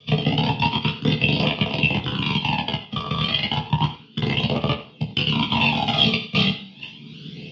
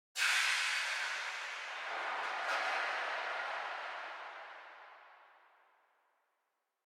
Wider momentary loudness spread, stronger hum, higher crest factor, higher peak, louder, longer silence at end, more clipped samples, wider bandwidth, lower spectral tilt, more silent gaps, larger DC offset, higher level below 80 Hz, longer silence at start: second, 9 LU vs 19 LU; neither; about the same, 20 dB vs 20 dB; first, -4 dBFS vs -20 dBFS; first, -21 LUFS vs -36 LUFS; second, 0 s vs 1.55 s; neither; second, 7.2 kHz vs 18 kHz; first, -6.5 dB/octave vs 3.5 dB/octave; neither; neither; first, -46 dBFS vs under -90 dBFS; about the same, 0.05 s vs 0.15 s